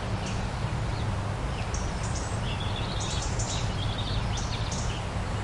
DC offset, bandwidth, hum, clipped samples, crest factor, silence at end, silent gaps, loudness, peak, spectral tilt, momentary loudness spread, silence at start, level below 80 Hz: under 0.1%; 11.5 kHz; none; under 0.1%; 12 dB; 0 s; none; -31 LUFS; -18 dBFS; -4.5 dB/octave; 2 LU; 0 s; -36 dBFS